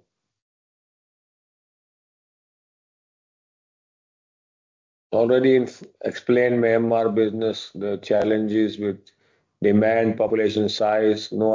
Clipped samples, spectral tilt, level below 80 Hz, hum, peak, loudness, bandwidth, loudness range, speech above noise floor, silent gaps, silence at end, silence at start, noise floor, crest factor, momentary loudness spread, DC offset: under 0.1%; -6.5 dB/octave; -62 dBFS; none; -6 dBFS; -21 LUFS; 7.6 kHz; 4 LU; over 70 dB; none; 0 s; 5.1 s; under -90 dBFS; 16 dB; 11 LU; under 0.1%